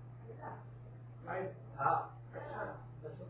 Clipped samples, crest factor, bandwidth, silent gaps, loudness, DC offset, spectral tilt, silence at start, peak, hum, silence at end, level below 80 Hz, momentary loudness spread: under 0.1%; 22 dB; 4 kHz; none; -42 LUFS; under 0.1%; -7 dB/octave; 0 s; -20 dBFS; none; 0 s; -66 dBFS; 17 LU